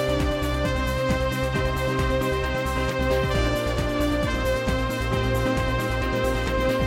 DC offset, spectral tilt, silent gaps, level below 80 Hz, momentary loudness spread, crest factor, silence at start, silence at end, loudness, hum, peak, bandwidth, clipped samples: under 0.1%; -5.5 dB/octave; none; -30 dBFS; 2 LU; 14 dB; 0 s; 0 s; -24 LUFS; none; -10 dBFS; 16.5 kHz; under 0.1%